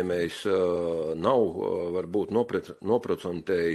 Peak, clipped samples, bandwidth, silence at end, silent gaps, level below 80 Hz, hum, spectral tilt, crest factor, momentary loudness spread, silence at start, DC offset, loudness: -10 dBFS; under 0.1%; 12.5 kHz; 0 s; none; -60 dBFS; none; -6.5 dB/octave; 18 dB; 6 LU; 0 s; under 0.1%; -28 LUFS